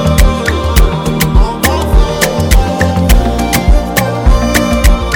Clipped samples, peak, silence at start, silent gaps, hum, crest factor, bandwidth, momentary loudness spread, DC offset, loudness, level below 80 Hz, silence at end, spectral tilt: 1%; 0 dBFS; 0 s; none; none; 8 dB; 19.5 kHz; 2 LU; under 0.1%; -11 LUFS; -12 dBFS; 0 s; -5 dB/octave